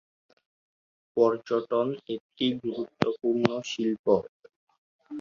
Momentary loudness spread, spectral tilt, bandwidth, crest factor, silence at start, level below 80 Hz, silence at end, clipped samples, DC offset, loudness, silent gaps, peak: 10 LU; -6 dB/octave; 7.4 kHz; 28 dB; 1.15 s; -66 dBFS; 0 s; under 0.1%; under 0.1%; -28 LUFS; 2.20-2.30 s, 3.99-4.04 s, 4.29-4.43 s, 4.56-4.67 s, 4.78-4.99 s; -2 dBFS